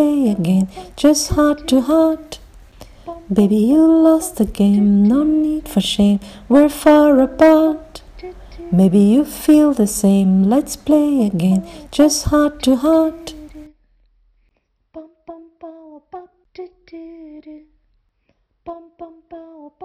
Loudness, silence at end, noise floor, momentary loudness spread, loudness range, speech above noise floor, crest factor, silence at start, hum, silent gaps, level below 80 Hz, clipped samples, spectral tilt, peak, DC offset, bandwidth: -14 LUFS; 0.15 s; -64 dBFS; 24 LU; 5 LU; 51 dB; 14 dB; 0 s; none; none; -40 dBFS; under 0.1%; -6 dB/octave; -2 dBFS; under 0.1%; 15.5 kHz